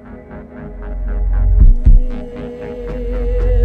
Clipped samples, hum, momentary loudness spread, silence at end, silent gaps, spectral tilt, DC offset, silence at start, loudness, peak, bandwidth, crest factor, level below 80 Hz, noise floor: under 0.1%; none; 19 LU; 0 s; none; -10 dB/octave; under 0.1%; 0.05 s; -18 LUFS; -2 dBFS; 3.1 kHz; 12 dB; -14 dBFS; -33 dBFS